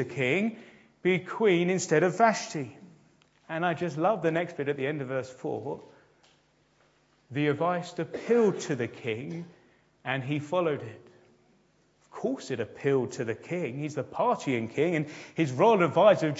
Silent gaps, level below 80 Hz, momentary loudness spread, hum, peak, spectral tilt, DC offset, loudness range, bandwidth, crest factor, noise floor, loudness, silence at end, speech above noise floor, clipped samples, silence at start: none; -74 dBFS; 13 LU; none; -8 dBFS; -6 dB/octave; under 0.1%; 7 LU; 8 kHz; 20 dB; -66 dBFS; -28 LUFS; 0 s; 38 dB; under 0.1%; 0 s